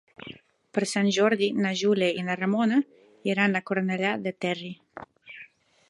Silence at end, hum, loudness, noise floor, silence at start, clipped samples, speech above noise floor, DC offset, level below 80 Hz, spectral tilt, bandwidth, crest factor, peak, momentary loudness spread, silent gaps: 0.45 s; none; -26 LUFS; -52 dBFS; 0.2 s; under 0.1%; 27 dB; under 0.1%; -74 dBFS; -5 dB/octave; 11.5 kHz; 18 dB; -8 dBFS; 21 LU; none